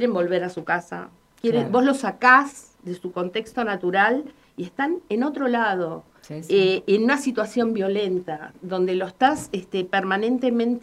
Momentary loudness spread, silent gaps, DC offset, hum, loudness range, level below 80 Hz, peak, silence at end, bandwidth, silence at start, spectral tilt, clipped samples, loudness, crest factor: 15 LU; none; under 0.1%; none; 3 LU; -64 dBFS; -4 dBFS; 0.05 s; 13 kHz; 0 s; -5.5 dB/octave; under 0.1%; -22 LUFS; 18 dB